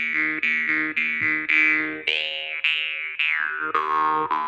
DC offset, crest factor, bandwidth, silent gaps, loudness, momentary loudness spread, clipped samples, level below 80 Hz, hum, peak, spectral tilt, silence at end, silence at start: under 0.1%; 18 dB; 8.4 kHz; none; -21 LUFS; 6 LU; under 0.1%; -68 dBFS; none; -6 dBFS; -3 dB/octave; 0 s; 0 s